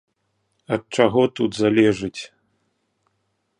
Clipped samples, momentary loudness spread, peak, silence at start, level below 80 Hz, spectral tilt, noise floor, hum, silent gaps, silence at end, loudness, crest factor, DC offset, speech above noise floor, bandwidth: under 0.1%; 15 LU; -2 dBFS; 0.7 s; -56 dBFS; -6 dB/octave; -72 dBFS; none; none; 1.35 s; -20 LUFS; 22 dB; under 0.1%; 52 dB; 10.5 kHz